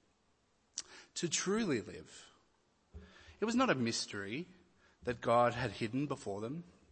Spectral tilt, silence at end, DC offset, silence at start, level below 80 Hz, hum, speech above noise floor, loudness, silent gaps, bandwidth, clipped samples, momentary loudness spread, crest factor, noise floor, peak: -4 dB/octave; 0.2 s; under 0.1%; 0.75 s; -66 dBFS; none; 39 dB; -36 LUFS; none; 8.4 kHz; under 0.1%; 20 LU; 20 dB; -75 dBFS; -18 dBFS